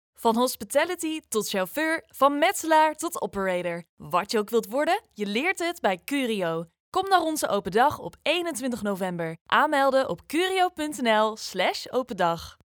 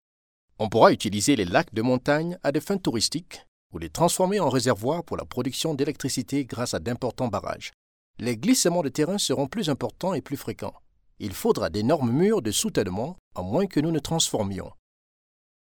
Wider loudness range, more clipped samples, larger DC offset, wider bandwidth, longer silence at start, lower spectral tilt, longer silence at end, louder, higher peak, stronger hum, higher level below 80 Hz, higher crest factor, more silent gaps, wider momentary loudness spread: about the same, 2 LU vs 4 LU; neither; neither; about the same, over 20 kHz vs over 20 kHz; second, 0.2 s vs 0.6 s; about the same, -3.5 dB/octave vs -4.5 dB/octave; second, 0.3 s vs 0.9 s; about the same, -25 LUFS vs -25 LUFS; about the same, -6 dBFS vs -4 dBFS; neither; second, -62 dBFS vs -54 dBFS; about the same, 20 dB vs 22 dB; second, 3.89-3.97 s, 6.80-6.92 s, 9.41-9.46 s vs 3.48-3.70 s, 7.74-8.14 s, 13.19-13.31 s; second, 8 LU vs 13 LU